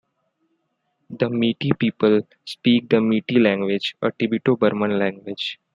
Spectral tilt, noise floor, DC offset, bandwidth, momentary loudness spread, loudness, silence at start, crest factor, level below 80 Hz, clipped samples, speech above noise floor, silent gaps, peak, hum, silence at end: -7.5 dB/octave; -72 dBFS; under 0.1%; 9.8 kHz; 8 LU; -21 LUFS; 1.1 s; 18 dB; -62 dBFS; under 0.1%; 52 dB; none; -2 dBFS; none; 0.2 s